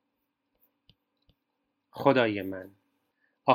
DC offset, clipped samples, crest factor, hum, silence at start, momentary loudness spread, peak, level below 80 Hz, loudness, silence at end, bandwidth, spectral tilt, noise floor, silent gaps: under 0.1%; under 0.1%; 24 dB; none; 1.95 s; 18 LU; -6 dBFS; -76 dBFS; -27 LUFS; 0 s; 16 kHz; -7.5 dB/octave; -81 dBFS; none